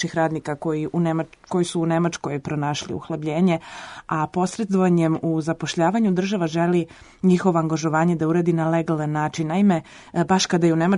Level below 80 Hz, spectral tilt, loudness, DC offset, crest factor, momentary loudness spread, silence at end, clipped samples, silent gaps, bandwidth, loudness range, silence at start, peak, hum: -58 dBFS; -6 dB/octave; -22 LUFS; under 0.1%; 16 dB; 8 LU; 0 s; under 0.1%; none; 11 kHz; 3 LU; 0 s; -6 dBFS; none